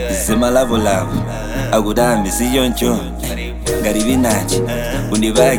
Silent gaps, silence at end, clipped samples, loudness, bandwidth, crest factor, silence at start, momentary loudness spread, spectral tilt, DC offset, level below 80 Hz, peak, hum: none; 0 s; under 0.1%; -16 LUFS; over 20 kHz; 16 dB; 0 s; 8 LU; -4.5 dB/octave; under 0.1%; -28 dBFS; 0 dBFS; none